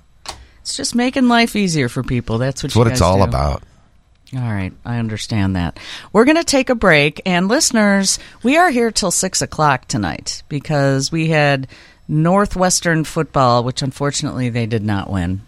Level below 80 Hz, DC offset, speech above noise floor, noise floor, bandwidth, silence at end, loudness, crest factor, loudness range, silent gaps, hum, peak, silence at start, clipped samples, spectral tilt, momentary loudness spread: -36 dBFS; under 0.1%; 35 dB; -51 dBFS; 15 kHz; 0.05 s; -16 LUFS; 16 dB; 5 LU; none; none; 0 dBFS; 0.25 s; under 0.1%; -4.5 dB/octave; 11 LU